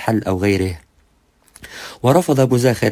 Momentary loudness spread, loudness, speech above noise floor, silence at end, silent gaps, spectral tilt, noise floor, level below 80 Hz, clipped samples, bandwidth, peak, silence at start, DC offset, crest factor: 19 LU; -17 LUFS; 42 dB; 0 s; none; -6.5 dB/octave; -57 dBFS; -40 dBFS; under 0.1%; 16 kHz; 0 dBFS; 0 s; under 0.1%; 18 dB